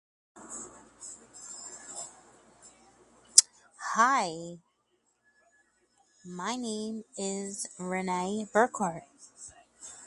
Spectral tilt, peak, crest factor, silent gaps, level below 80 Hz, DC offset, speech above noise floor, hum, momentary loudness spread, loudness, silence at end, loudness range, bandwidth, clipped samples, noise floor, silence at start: -2 dB/octave; 0 dBFS; 34 dB; none; -74 dBFS; under 0.1%; 43 dB; none; 24 LU; -29 LUFS; 0 s; 11 LU; 11.5 kHz; under 0.1%; -74 dBFS; 0.35 s